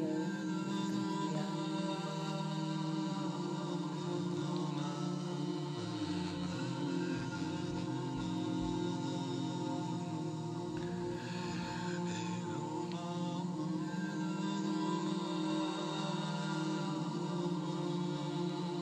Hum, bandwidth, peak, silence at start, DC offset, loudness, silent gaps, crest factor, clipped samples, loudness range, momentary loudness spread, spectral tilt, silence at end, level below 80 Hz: none; 10 kHz; -24 dBFS; 0 s; under 0.1%; -38 LUFS; none; 14 dB; under 0.1%; 2 LU; 3 LU; -6 dB/octave; 0 s; -66 dBFS